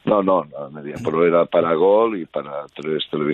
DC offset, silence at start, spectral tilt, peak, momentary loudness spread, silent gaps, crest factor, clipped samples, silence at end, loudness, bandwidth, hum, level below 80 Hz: under 0.1%; 0.05 s; -7.5 dB/octave; -6 dBFS; 15 LU; none; 14 dB; under 0.1%; 0 s; -19 LUFS; 8.4 kHz; none; -60 dBFS